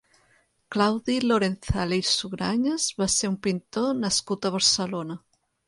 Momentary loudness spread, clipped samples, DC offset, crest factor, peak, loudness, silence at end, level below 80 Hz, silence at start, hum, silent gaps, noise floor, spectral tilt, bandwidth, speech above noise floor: 8 LU; under 0.1%; under 0.1%; 20 dB; -6 dBFS; -24 LUFS; 0.5 s; -48 dBFS; 0.7 s; none; none; -65 dBFS; -3.5 dB/octave; 11.5 kHz; 40 dB